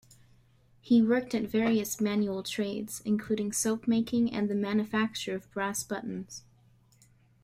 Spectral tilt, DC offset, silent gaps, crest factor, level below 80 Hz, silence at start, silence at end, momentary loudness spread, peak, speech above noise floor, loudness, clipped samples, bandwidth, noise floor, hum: -4.5 dB/octave; under 0.1%; none; 16 dB; -64 dBFS; 0.85 s; 1.05 s; 9 LU; -14 dBFS; 33 dB; -30 LUFS; under 0.1%; 16 kHz; -62 dBFS; none